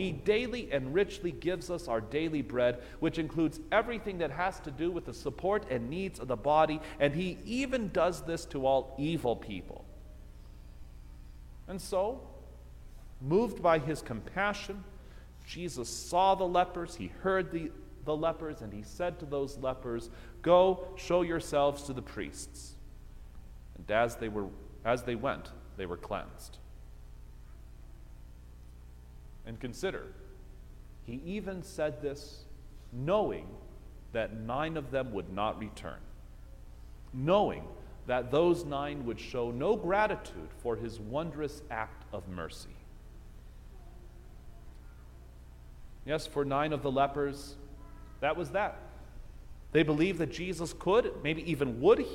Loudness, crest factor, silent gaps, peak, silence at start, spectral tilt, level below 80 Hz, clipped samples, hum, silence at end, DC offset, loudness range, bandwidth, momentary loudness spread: -33 LUFS; 22 dB; none; -12 dBFS; 0 s; -5.5 dB/octave; -50 dBFS; under 0.1%; 60 Hz at -55 dBFS; 0 s; under 0.1%; 13 LU; 16.5 kHz; 25 LU